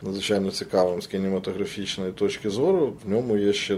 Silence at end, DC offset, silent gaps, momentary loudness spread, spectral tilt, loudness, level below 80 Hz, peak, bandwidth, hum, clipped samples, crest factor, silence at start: 0 s; under 0.1%; none; 7 LU; -5 dB/octave; -25 LUFS; -58 dBFS; -10 dBFS; 13.5 kHz; none; under 0.1%; 16 dB; 0 s